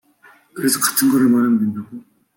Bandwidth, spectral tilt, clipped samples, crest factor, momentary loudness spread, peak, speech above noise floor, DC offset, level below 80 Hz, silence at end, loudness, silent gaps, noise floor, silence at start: 17 kHz; -3.5 dB/octave; under 0.1%; 16 dB; 18 LU; -2 dBFS; 34 dB; under 0.1%; -66 dBFS; 0.35 s; -16 LUFS; none; -51 dBFS; 0.55 s